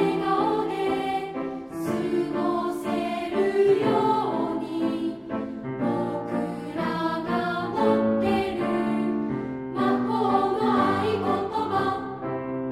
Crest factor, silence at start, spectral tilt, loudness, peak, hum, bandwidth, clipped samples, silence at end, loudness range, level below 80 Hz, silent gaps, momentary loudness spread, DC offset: 16 dB; 0 s; -7 dB/octave; -25 LUFS; -8 dBFS; none; 15 kHz; under 0.1%; 0 s; 3 LU; -56 dBFS; none; 9 LU; under 0.1%